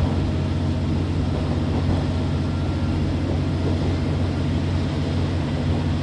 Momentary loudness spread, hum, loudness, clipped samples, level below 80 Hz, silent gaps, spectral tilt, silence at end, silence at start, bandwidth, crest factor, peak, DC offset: 1 LU; none; -23 LUFS; under 0.1%; -28 dBFS; none; -8 dB/octave; 0 s; 0 s; 9.6 kHz; 12 dB; -10 dBFS; under 0.1%